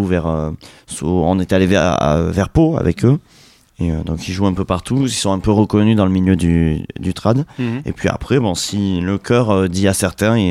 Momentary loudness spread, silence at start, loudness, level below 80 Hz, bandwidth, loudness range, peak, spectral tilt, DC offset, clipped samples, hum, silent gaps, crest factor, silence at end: 8 LU; 0 s; -16 LUFS; -34 dBFS; 15 kHz; 2 LU; -2 dBFS; -6 dB/octave; under 0.1%; under 0.1%; none; none; 14 dB; 0 s